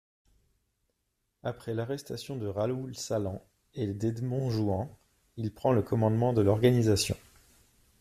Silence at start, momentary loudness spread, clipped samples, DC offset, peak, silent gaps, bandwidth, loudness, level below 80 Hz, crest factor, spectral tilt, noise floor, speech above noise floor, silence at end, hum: 1.45 s; 15 LU; under 0.1%; under 0.1%; -10 dBFS; none; 15 kHz; -30 LUFS; -60 dBFS; 20 dB; -6.5 dB/octave; -80 dBFS; 51 dB; 0.85 s; none